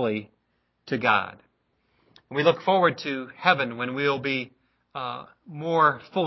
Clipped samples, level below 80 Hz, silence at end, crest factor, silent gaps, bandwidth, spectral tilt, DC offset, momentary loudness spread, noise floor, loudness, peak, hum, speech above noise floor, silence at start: under 0.1%; -70 dBFS; 0 s; 22 dB; none; 6 kHz; -6.5 dB/octave; under 0.1%; 15 LU; -72 dBFS; -25 LUFS; -4 dBFS; none; 48 dB; 0 s